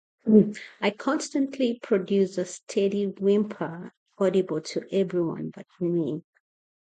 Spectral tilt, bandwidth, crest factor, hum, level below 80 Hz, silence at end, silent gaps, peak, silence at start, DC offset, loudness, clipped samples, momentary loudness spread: -6.5 dB/octave; 9.2 kHz; 20 dB; none; -70 dBFS; 0.7 s; 2.63-2.67 s, 3.97-4.06 s; -6 dBFS; 0.25 s; under 0.1%; -26 LUFS; under 0.1%; 13 LU